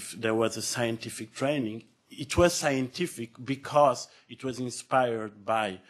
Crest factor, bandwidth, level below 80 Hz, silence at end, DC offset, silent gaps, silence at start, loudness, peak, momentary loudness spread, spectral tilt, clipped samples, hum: 22 dB; 13 kHz; -54 dBFS; 0.1 s; under 0.1%; none; 0 s; -29 LUFS; -8 dBFS; 14 LU; -4.5 dB/octave; under 0.1%; none